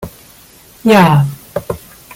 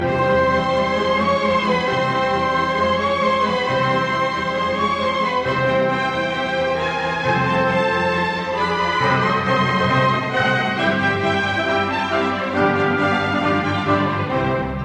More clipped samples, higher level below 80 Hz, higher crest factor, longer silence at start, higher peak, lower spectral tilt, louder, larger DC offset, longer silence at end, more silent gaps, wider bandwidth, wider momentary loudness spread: neither; about the same, -44 dBFS vs -46 dBFS; about the same, 14 dB vs 14 dB; about the same, 0 s vs 0 s; first, 0 dBFS vs -4 dBFS; about the same, -6.5 dB/octave vs -6 dB/octave; first, -12 LUFS vs -19 LUFS; neither; first, 0.4 s vs 0 s; neither; first, 17 kHz vs 9.8 kHz; first, 18 LU vs 3 LU